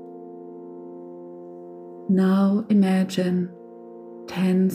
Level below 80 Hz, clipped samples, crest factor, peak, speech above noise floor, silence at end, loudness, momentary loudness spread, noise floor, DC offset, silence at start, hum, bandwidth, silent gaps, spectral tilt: -72 dBFS; under 0.1%; 14 dB; -10 dBFS; 22 dB; 0 s; -22 LUFS; 21 LU; -41 dBFS; under 0.1%; 0 s; none; 11 kHz; none; -8 dB/octave